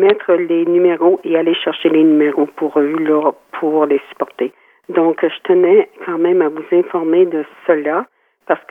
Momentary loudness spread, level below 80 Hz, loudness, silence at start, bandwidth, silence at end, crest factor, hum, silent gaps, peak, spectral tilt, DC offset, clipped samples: 9 LU; -76 dBFS; -15 LUFS; 0 s; 4.1 kHz; 0.1 s; 14 dB; none; none; 0 dBFS; -7.5 dB/octave; under 0.1%; under 0.1%